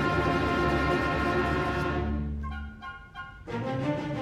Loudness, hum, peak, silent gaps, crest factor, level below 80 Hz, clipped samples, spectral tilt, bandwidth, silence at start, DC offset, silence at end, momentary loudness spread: -28 LUFS; none; -12 dBFS; none; 16 dB; -38 dBFS; under 0.1%; -7 dB/octave; 14 kHz; 0 s; under 0.1%; 0 s; 16 LU